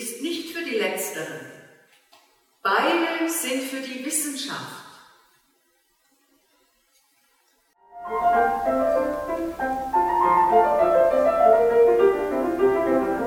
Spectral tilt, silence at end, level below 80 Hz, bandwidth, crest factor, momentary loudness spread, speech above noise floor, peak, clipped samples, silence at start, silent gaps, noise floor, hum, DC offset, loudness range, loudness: -3 dB/octave; 0 s; -52 dBFS; 18 kHz; 18 dB; 13 LU; 40 dB; -6 dBFS; under 0.1%; 0 s; none; -66 dBFS; none; under 0.1%; 13 LU; -22 LUFS